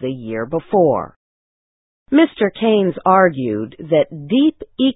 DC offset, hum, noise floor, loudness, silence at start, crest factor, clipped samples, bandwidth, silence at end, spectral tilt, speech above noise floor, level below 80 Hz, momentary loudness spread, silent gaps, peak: under 0.1%; none; under -90 dBFS; -17 LUFS; 0 s; 18 dB; under 0.1%; 4 kHz; 0.05 s; -11 dB/octave; over 74 dB; -54 dBFS; 10 LU; 1.16-2.06 s; 0 dBFS